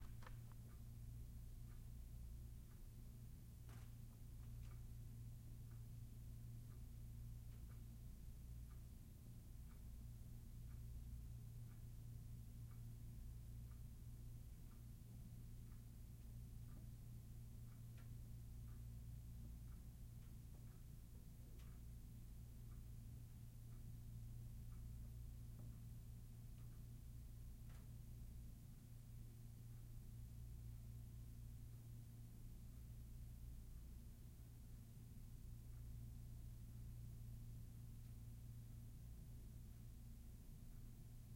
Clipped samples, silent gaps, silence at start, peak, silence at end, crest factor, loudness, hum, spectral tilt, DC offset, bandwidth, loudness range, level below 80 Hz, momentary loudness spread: under 0.1%; none; 0 s; -44 dBFS; 0 s; 12 dB; -59 LUFS; none; -6.5 dB/octave; under 0.1%; 16.5 kHz; 2 LU; -58 dBFS; 3 LU